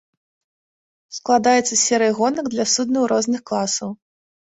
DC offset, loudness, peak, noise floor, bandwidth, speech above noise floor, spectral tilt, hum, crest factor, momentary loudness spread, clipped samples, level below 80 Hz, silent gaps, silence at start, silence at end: under 0.1%; -18 LUFS; -4 dBFS; under -90 dBFS; 8.4 kHz; over 71 dB; -2.5 dB/octave; none; 18 dB; 9 LU; under 0.1%; -64 dBFS; none; 1.1 s; 0.65 s